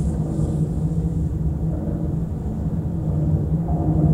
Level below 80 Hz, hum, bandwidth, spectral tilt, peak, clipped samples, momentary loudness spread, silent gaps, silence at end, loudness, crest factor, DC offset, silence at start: -28 dBFS; none; 9.8 kHz; -10.5 dB/octave; -6 dBFS; under 0.1%; 4 LU; none; 0 s; -23 LUFS; 16 dB; under 0.1%; 0 s